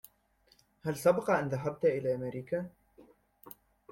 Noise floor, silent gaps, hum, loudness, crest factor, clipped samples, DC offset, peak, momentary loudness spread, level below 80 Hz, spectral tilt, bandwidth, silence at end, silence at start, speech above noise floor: -69 dBFS; none; none; -32 LUFS; 20 dB; under 0.1%; under 0.1%; -14 dBFS; 24 LU; -68 dBFS; -6.5 dB/octave; 16.5 kHz; 0.45 s; 0.85 s; 38 dB